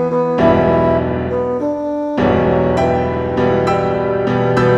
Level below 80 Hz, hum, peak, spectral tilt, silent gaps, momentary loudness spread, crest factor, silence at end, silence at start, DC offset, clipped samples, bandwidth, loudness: -34 dBFS; none; 0 dBFS; -8 dB/octave; none; 6 LU; 14 dB; 0 s; 0 s; under 0.1%; under 0.1%; 10.5 kHz; -15 LUFS